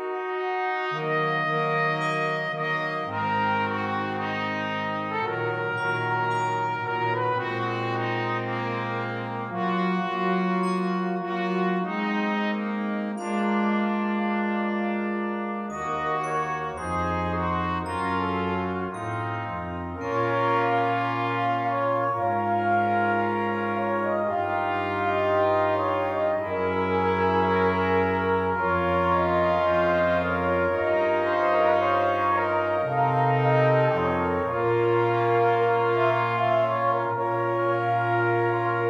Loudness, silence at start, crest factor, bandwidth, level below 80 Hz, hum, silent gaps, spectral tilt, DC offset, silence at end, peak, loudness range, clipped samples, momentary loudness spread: -25 LUFS; 0 s; 16 dB; 10.5 kHz; -56 dBFS; none; none; -7.5 dB/octave; under 0.1%; 0 s; -10 dBFS; 5 LU; under 0.1%; 6 LU